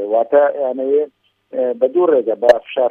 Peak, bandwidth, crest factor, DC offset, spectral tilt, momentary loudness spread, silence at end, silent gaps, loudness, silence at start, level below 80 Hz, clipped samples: 0 dBFS; 7 kHz; 16 dB; under 0.1%; -5.5 dB/octave; 8 LU; 0 s; none; -16 LUFS; 0 s; -62 dBFS; under 0.1%